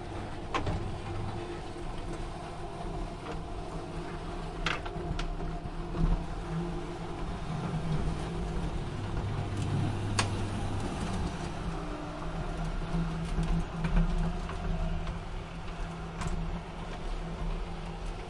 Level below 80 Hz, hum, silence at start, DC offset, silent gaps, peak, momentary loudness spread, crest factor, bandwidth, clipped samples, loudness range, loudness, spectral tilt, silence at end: -38 dBFS; none; 0 s; under 0.1%; none; -12 dBFS; 8 LU; 22 dB; 11.5 kHz; under 0.1%; 5 LU; -36 LUFS; -6 dB/octave; 0 s